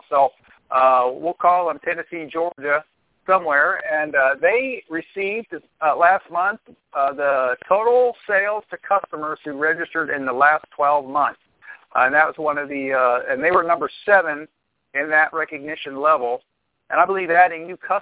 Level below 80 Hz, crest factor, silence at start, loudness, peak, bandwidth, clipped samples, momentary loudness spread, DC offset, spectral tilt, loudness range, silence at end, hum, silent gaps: -66 dBFS; 18 dB; 0.1 s; -20 LUFS; -2 dBFS; 4 kHz; under 0.1%; 11 LU; under 0.1%; -7.5 dB/octave; 2 LU; 0 s; none; none